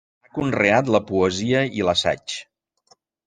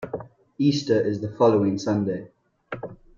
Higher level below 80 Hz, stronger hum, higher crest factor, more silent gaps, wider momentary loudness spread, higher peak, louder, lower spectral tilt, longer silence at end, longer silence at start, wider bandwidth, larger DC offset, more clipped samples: about the same, -56 dBFS vs -60 dBFS; neither; about the same, 20 dB vs 18 dB; neither; second, 13 LU vs 17 LU; first, -2 dBFS vs -6 dBFS; first, -20 LUFS vs -23 LUFS; second, -5 dB/octave vs -7 dB/octave; first, 0.85 s vs 0.25 s; first, 0.35 s vs 0 s; first, 9.8 kHz vs 7.4 kHz; neither; neither